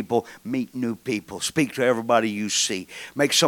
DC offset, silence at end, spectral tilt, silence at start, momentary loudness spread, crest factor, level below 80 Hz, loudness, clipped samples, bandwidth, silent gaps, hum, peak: under 0.1%; 0 s; -3 dB/octave; 0 s; 8 LU; 20 dB; -64 dBFS; -24 LUFS; under 0.1%; 19 kHz; none; none; -4 dBFS